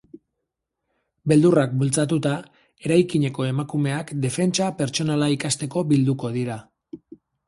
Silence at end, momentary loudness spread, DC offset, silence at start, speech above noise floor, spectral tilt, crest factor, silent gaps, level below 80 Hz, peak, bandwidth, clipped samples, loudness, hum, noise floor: 0.5 s; 12 LU; under 0.1%; 1.25 s; 60 dB; -5.5 dB/octave; 18 dB; none; -60 dBFS; -4 dBFS; 11.5 kHz; under 0.1%; -22 LUFS; none; -81 dBFS